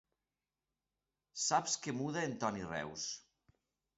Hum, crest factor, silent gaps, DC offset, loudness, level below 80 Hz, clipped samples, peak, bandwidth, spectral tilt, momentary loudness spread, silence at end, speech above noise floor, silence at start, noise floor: none; 22 dB; none; under 0.1%; -38 LUFS; -72 dBFS; under 0.1%; -18 dBFS; 8 kHz; -3 dB/octave; 9 LU; 0.75 s; over 52 dB; 1.35 s; under -90 dBFS